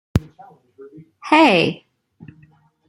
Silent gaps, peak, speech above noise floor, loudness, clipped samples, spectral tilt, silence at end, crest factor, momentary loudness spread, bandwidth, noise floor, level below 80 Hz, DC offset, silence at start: none; -2 dBFS; 35 dB; -16 LUFS; under 0.1%; -6 dB/octave; 1.15 s; 20 dB; 24 LU; 15.5 kHz; -53 dBFS; -42 dBFS; under 0.1%; 0.15 s